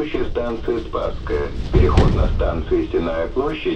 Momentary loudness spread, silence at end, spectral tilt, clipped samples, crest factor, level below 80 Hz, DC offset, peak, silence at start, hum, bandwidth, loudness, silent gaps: 8 LU; 0 s; -8 dB/octave; under 0.1%; 18 dB; -22 dBFS; under 0.1%; 0 dBFS; 0 s; none; 8.4 kHz; -21 LUFS; none